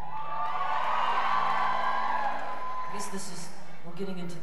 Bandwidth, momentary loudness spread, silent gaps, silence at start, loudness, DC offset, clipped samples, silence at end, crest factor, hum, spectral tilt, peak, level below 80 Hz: 15 kHz; 13 LU; none; 0 s; -31 LUFS; 4%; under 0.1%; 0 s; 14 dB; none; -3.5 dB/octave; -14 dBFS; -66 dBFS